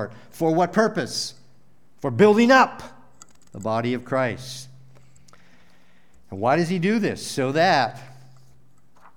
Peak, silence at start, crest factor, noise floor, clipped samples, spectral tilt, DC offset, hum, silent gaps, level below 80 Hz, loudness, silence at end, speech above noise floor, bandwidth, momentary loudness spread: -4 dBFS; 0 s; 20 dB; -60 dBFS; under 0.1%; -5 dB/octave; 0.5%; none; none; -64 dBFS; -21 LUFS; 1.1 s; 39 dB; 17 kHz; 19 LU